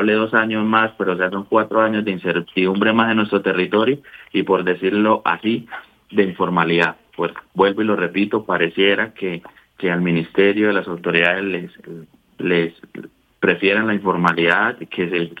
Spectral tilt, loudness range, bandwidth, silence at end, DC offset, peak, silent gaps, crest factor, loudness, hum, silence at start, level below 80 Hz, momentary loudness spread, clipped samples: -7.5 dB/octave; 2 LU; 8.2 kHz; 0.05 s; under 0.1%; 0 dBFS; none; 18 dB; -18 LUFS; none; 0 s; -62 dBFS; 11 LU; under 0.1%